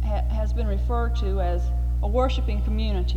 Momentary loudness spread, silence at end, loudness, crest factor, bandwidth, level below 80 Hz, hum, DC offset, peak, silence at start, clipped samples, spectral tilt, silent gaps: 3 LU; 0 s; -25 LUFS; 12 dB; 6.6 kHz; -24 dBFS; 60 Hz at -25 dBFS; under 0.1%; -10 dBFS; 0 s; under 0.1%; -8 dB/octave; none